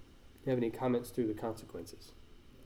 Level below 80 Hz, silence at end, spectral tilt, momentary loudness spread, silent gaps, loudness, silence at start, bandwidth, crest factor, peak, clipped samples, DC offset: -60 dBFS; 0 s; -7 dB/octave; 18 LU; none; -37 LUFS; 0 s; 17 kHz; 16 dB; -22 dBFS; under 0.1%; under 0.1%